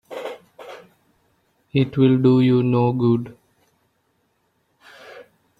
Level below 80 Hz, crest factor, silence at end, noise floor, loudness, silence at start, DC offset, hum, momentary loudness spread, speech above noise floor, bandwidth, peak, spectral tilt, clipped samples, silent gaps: -60 dBFS; 18 dB; 0.35 s; -68 dBFS; -18 LUFS; 0.1 s; under 0.1%; none; 25 LU; 51 dB; 5.2 kHz; -4 dBFS; -9.5 dB/octave; under 0.1%; none